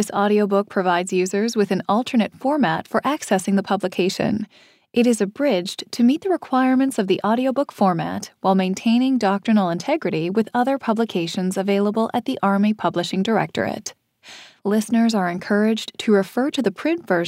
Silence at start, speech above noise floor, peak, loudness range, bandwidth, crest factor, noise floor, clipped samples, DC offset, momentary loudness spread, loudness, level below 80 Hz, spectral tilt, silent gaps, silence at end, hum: 0 s; 24 dB; -4 dBFS; 2 LU; 16 kHz; 16 dB; -44 dBFS; under 0.1%; under 0.1%; 5 LU; -20 LUFS; -68 dBFS; -5.5 dB/octave; none; 0 s; none